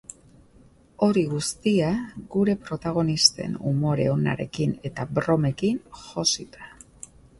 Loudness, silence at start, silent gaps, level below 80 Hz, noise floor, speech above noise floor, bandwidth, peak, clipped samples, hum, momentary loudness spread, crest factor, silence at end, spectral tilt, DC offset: -24 LUFS; 1 s; none; -54 dBFS; -54 dBFS; 30 dB; 11.5 kHz; -2 dBFS; under 0.1%; none; 21 LU; 22 dB; 0.7 s; -4.5 dB/octave; under 0.1%